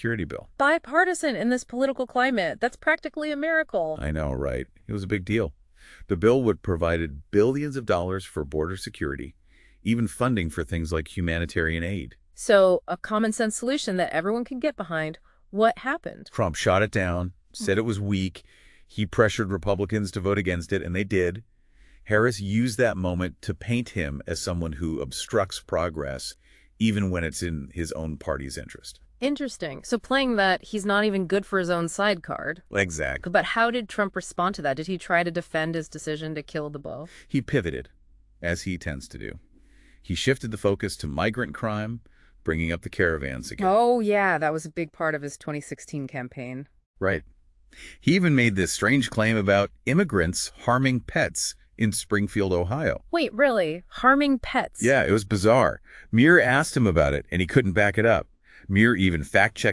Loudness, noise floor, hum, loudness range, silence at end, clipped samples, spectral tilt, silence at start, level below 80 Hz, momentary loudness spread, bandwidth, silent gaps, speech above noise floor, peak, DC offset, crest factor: -25 LUFS; -54 dBFS; none; 8 LU; 0 s; under 0.1%; -5.5 dB/octave; 0 s; -46 dBFS; 12 LU; 12 kHz; 46.86-46.94 s; 29 dB; -4 dBFS; under 0.1%; 22 dB